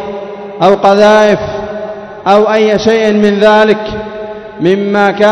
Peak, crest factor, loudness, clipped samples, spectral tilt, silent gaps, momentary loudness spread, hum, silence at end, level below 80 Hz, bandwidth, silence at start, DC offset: 0 dBFS; 10 dB; -9 LUFS; 2%; -5.5 dB/octave; none; 16 LU; none; 0 s; -42 dBFS; 11 kHz; 0 s; under 0.1%